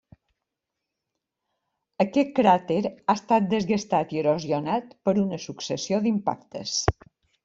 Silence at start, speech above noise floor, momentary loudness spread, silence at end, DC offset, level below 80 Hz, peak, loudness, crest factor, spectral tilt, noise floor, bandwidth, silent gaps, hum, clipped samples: 2 s; 60 dB; 9 LU; 0.55 s; under 0.1%; -52 dBFS; -2 dBFS; -25 LUFS; 24 dB; -5 dB/octave; -84 dBFS; 7.8 kHz; none; none; under 0.1%